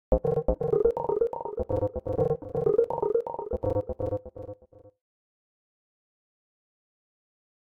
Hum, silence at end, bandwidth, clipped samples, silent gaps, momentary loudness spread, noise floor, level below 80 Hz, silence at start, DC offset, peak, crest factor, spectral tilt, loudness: none; 2.85 s; 3.2 kHz; under 0.1%; none; 10 LU; -50 dBFS; -42 dBFS; 0.1 s; under 0.1%; -10 dBFS; 20 dB; -11 dB/octave; -28 LUFS